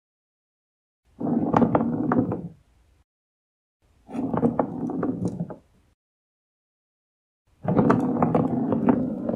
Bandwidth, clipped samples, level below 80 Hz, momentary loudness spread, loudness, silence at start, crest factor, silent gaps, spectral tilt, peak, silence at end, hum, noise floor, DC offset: 7 kHz; under 0.1%; -56 dBFS; 13 LU; -24 LUFS; 1.2 s; 24 dB; 3.04-3.80 s, 5.94-7.45 s; -10 dB/octave; -4 dBFS; 0 s; none; -59 dBFS; under 0.1%